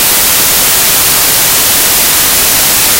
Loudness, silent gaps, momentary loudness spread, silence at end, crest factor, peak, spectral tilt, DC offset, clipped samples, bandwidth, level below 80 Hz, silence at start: -5 LUFS; none; 0 LU; 0 s; 8 dB; 0 dBFS; 0 dB/octave; under 0.1%; 0.9%; over 20 kHz; -32 dBFS; 0 s